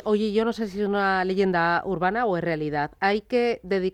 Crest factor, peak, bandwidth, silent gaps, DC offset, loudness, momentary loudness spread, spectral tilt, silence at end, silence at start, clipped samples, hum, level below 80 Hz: 14 dB; -10 dBFS; 10 kHz; none; under 0.1%; -24 LUFS; 4 LU; -7 dB/octave; 0.05 s; 0.05 s; under 0.1%; none; -54 dBFS